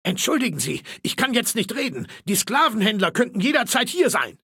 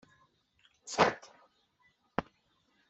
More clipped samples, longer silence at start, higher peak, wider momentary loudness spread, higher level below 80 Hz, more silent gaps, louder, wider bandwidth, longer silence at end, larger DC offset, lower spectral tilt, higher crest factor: neither; second, 0.05 s vs 0.85 s; first, -4 dBFS vs -10 dBFS; second, 8 LU vs 19 LU; about the same, -64 dBFS vs -68 dBFS; neither; first, -21 LUFS vs -33 LUFS; first, 17 kHz vs 8.2 kHz; second, 0.1 s vs 0.7 s; neither; about the same, -3 dB/octave vs -3.5 dB/octave; second, 18 dB vs 28 dB